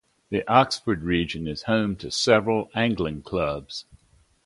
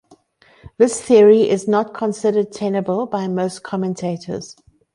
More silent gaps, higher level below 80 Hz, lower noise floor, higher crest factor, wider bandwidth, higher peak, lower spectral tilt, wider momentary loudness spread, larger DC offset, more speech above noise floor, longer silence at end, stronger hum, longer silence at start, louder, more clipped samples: neither; first, -48 dBFS vs -58 dBFS; first, -61 dBFS vs -53 dBFS; first, 22 dB vs 16 dB; about the same, 11.5 kHz vs 11 kHz; about the same, -2 dBFS vs -2 dBFS; about the same, -5 dB/octave vs -6 dB/octave; second, 10 LU vs 14 LU; neither; about the same, 37 dB vs 36 dB; first, 0.65 s vs 0.45 s; neither; second, 0.3 s vs 0.65 s; second, -24 LUFS vs -17 LUFS; neither